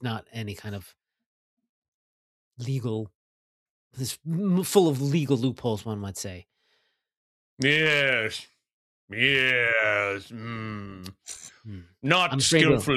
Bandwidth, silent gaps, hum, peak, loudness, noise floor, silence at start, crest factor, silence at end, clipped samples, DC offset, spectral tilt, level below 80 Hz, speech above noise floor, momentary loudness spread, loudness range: 14.5 kHz; 1.26-1.57 s, 1.69-1.82 s, 1.88-2.51 s, 3.15-3.91 s, 7.17-7.57 s, 8.73-9.08 s; none; -4 dBFS; -24 LUFS; -72 dBFS; 0 s; 22 dB; 0 s; under 0.1%; under 0.1%; -4 dB/octave; -60 dBFS; 46 dB; 20 LU; 13 LU